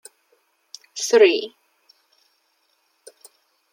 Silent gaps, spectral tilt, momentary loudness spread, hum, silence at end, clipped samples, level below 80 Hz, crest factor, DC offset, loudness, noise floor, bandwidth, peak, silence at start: none; -1 dB/octave; 28 LU; none; 2.25 s; under 0.1%; -86 dBFS; 22 dB; under 0.1%; -18 LUFS; -67 dBFS; 16 kHz; -2 dBFS; 0.95 s